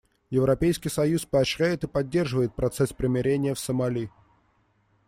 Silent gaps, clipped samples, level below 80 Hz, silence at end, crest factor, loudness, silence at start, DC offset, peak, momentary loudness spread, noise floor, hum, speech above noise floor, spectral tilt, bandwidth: none; under 0.1%; -48 dBFS; 1 s; 16 dB; -26 LUFS; 0.3 s; under 0.1%; -10 dBFS; 5 LU; -66 dBFS; none; 42 dB; -6 dB/octave; 16 kHz